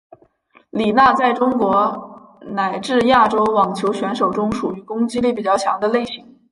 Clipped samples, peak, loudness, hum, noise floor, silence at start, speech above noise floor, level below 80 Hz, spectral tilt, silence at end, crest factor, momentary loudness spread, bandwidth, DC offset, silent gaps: under 0.1%; -2 dBFS; -17 LUFS; none; -54 dBFS; 0.75 s; 37 dB; -52 dBFS; -5.5 dB/octave; 0.3 s; 16 dB; 11 LU; 11.5 kHz; under 0.1%; none